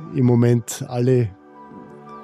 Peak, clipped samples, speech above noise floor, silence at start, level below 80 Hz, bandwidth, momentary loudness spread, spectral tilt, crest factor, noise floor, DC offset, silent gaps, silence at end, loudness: -4 dBFS; under 0.1%; 23 dB; 0 s; -60 dBFS; 14.5 kHz; 24 LU; -7.5 dB/octave; 16 dB; -41 dBFS; under 0.1%; none; 0 s; -19 LUFS